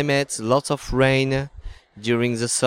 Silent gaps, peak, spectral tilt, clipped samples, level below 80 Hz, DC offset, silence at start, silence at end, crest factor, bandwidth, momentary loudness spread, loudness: none; -4 dBFS; -4.5 dB/octave; under 0.1%; -40 dBFS; under 0.1%; 0 s; 0 s; 16 dB; 16 kHz; 8 LU; -21 LUFS